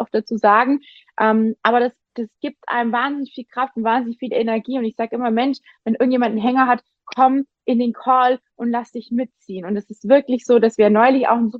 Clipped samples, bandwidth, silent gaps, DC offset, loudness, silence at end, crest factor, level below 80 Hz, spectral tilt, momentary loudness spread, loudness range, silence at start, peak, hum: under 0.1%; 7.6 kHz; none; under 0.1%; -18 LUFS; 0 s; 18 dB; -68 dBFS; -6.5 dB/octave; 13 LU; 4 LU; 0 s; -2 dBFS; none